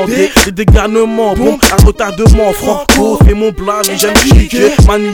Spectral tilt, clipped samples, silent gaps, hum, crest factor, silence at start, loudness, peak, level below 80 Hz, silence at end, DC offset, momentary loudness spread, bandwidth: -5 dB/octave; 4%; none; none; 8 dB; 0 s; -9 LUFS; 0 dBFS; -12 dBFS; 0 s; under 0.1%; 5 LU; 19.5 kHz